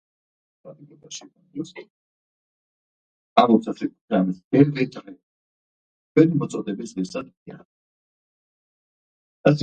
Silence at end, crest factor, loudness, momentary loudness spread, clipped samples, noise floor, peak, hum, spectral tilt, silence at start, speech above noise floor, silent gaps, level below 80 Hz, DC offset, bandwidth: 0 s; 24 dB; -22 LUFS; 20 LU; under 0.1%; under -90 dBFS; -2 dBFS; none; -7 dB/octave; 0.65 s; over 67 dB; 1.90-3.36 s, 4.01-4.08 s, 4.44-4.51 s, 5.23-6.15 s, 7.37-7.46 s, 7.65-9.44 s; -66 dBFS; under 0.1%; 9 kHz